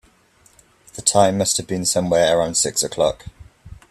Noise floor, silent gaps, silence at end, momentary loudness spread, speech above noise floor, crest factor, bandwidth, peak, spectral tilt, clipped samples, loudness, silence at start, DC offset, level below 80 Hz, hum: -55 dBFS; none; 0.15 s; 6 LU; 37 dB; 20 dB; 14.5 kHz; 0 dBFS; -3 dB/octave; under 0.1%; -18 LUFS; 0.95 s; under 0.1%; -48 dBFS; none